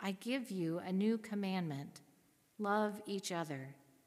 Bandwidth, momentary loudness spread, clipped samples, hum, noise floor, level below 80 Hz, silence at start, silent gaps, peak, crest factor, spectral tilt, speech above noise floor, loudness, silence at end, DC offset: 15.5 kHz; 11 LU; under 0.1%; none; -71 dBFS; -88 dBFS; 0 s; none; -22 dBFS; 18 dB; -5.5 dB/octave; 32 dB; -39 LUFS; 0.3 s; under 0.1%